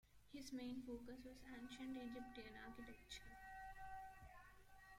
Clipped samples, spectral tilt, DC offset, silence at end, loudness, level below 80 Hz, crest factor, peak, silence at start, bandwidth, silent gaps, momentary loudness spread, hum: under 0.1%; -4 dB/octave; under 0.1%; 0 s; -56 LUFS; -68 dBFS; 14 dB; -42 dBFS; 0.05 s; 16.5 kHz; none; 11 LU; none